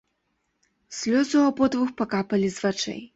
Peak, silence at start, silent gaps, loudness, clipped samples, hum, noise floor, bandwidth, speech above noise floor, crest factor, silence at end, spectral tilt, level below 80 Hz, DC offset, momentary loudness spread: -8 dBFS; 0.9 s; none; -24 LUFS; under 0.1%; none; -74 dBFS; 8 kHz; 51 dB; 16 dB; 0.1 s; -5 dB/octave; -62 dBFS; under 0.1%; 9 LU